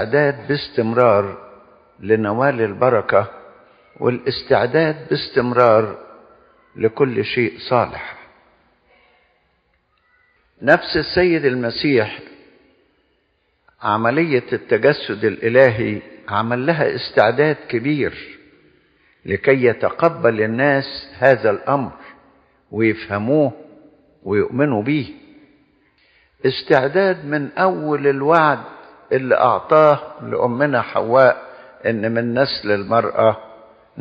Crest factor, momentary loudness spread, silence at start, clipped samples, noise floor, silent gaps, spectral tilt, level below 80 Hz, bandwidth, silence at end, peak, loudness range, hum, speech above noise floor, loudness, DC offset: 18 dB; 11 LU; 0 s; under 0.1%; -65 dBFS; none; -4.5 dB/octave; -54 dBFS; 5.6 kHz; 0 s; 0 dBFS; 5 LU; none; 48 dB; -17 LUFS; under 0.1%